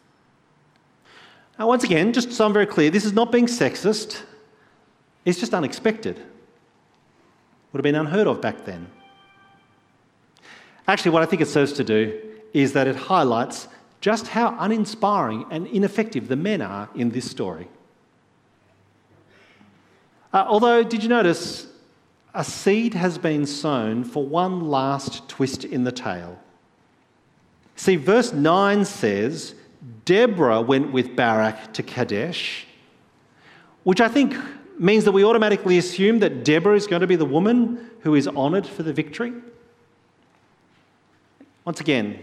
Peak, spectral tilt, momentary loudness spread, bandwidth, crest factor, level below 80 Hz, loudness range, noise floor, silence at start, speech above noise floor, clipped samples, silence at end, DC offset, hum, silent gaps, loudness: -2 dBFS; -5.5 dB/octave; 13 LU; 13.5 kHz; 22 dB; -66 dBFS; 9 LU; -60 dBFS; 1.6 s; 40 dB; under 0.1%; 0 s; under 0.1%; none; none; -21 LUFS